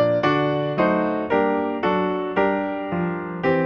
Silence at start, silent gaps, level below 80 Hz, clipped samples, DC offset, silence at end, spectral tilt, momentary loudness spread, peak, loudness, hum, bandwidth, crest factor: 0 s; none; -54 dBFS; under 0.1%; under 0.1%; 0 s; -8.5 dB/octave; 5 LU; -6 dBFS; -22 LUFS; none; 6.6 kHz; 14 dB